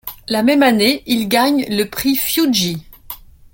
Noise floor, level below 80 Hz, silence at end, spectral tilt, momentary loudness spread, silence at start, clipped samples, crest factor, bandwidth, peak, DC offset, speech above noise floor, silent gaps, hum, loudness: -36 dBFS; -48 dBFS; 0.4 s; -3.5 dB/octave; 20 LU; 0.05 s; under 0.1%; 16 dB; 17 kHz; 0 dBFS; under 0.1%; 21 dB; none; none; -15 LUFS